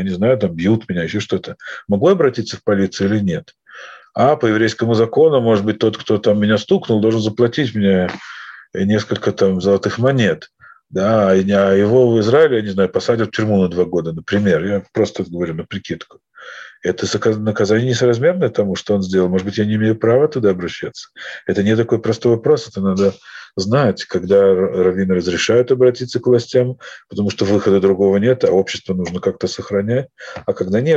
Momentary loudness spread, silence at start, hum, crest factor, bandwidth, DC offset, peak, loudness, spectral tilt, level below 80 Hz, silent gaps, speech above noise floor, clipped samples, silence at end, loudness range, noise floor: 13 LU; 0 s; none; 14 dB; 8 kHz; under 0.1%; 0 dBFS; -16 LUFS; -6.5 dB/octave; -54 dBFS; none; 23 dB; under 0.1%; 0 s; 4 LU; -38 dBFS